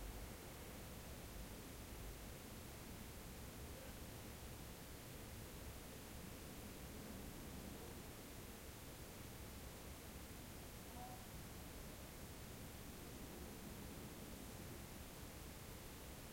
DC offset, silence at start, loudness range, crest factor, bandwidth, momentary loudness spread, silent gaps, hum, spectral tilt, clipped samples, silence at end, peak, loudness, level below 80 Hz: under 0.1%; 0 s; 1 LU; 14 dB; 16.5 kHz; 1 LU; none; none; -4 dB/octave; under 0.1%; 0 s; -40 dBFS; -54 LUFS; -60 dBFS